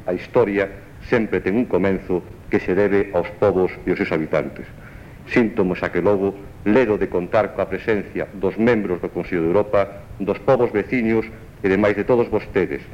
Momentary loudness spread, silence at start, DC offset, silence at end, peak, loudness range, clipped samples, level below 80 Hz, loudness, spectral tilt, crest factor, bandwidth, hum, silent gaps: 8 LU; 0 s; under 0.1%; 0 s; -4 dBFS; 1 LU; under 0.1%; -44 dBFS; -20 LUFS; -8 dB/octave; 16 dB; 9.6 kHz; none; none